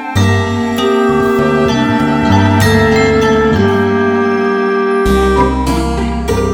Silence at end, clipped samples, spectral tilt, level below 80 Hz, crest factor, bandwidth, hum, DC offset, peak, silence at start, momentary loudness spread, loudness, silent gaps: 0 s; under 0.1%; -6 dB/octave; -24 dBFS; 10 dB; 18.5 kHz; none; under 0.1%; 0 dBFS; 0 s; 5 LU; -12 LUFS; none